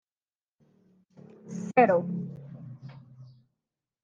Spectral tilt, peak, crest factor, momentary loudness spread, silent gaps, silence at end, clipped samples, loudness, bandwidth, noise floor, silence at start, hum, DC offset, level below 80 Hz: -8 dB/octave; -8 dBFS; 24 dB; 25 LU; none; 0.8 s; under 0.1%; -26 LUFS; 7.6 kHz; under -90 dBFS; 1.45 s; none; under 0.1%; -78 dBFS